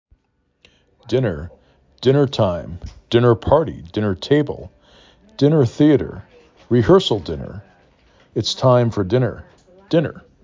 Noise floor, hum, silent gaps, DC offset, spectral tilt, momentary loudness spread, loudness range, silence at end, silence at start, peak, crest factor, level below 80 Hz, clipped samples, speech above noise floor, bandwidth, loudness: -66 dBFS; none; none; under 0.1%; -7 dB/octave; 19 LU; 3 LU; 0.25 s; 1.05 s; -2 dBFS; 18 dB; -42 dBFS; under 0.1%; 49 dB; 7.6 kHz; -18 LUFS